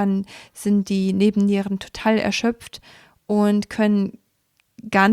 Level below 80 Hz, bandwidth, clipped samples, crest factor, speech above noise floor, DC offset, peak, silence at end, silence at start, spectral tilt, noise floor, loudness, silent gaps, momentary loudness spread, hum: -56 dBFS; 13 kHz; under 0.1%; 16 dB; 47 dB; under 0.1%; -4 dBFS; 0 s; 0 s; -6 dB/octave; -67 dBFS; -21 LUFS; none; 15 LU; none